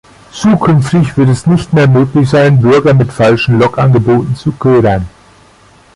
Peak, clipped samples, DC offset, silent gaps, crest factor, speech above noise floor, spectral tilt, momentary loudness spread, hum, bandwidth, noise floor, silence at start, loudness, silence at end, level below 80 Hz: 0 dBFS; under 0.1%; under 0.1%; none; 8 dB; 34 dB; -7.5 dB/octave; 6 LU; none; 11.5 kHz; -42 dBFS; 0.35 s; -9 LUFS; 0.85 s; -36 dBFS